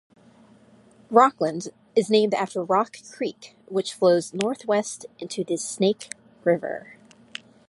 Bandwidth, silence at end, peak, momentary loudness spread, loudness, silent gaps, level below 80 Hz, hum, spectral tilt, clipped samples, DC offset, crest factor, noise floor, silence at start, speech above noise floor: 11.5 kHz; 0.9 s; -2 dBFS; 16 LU; -24 LUFS; none; -74 dBFS; none; -4.5 dB/octave; under 0.1%; under 0.1%; 22 dB; -54 dBFS; 1.1 s; 31 dB